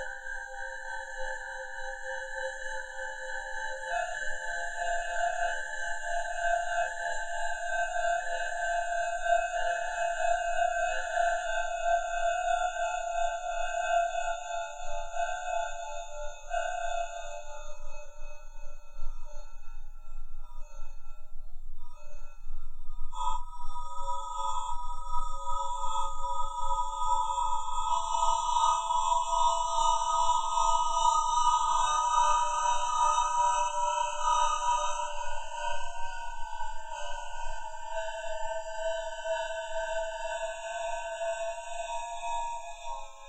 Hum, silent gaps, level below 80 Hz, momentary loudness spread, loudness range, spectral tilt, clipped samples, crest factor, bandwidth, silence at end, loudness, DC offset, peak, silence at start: none; none; -40 dBFS; 20 LU; 15 LU; 0 dB/octave; under 0.1%; 16 dB; 9 kHz; 0 s; -31 LUFS; under 0.1%; -12 dBFS; 0 s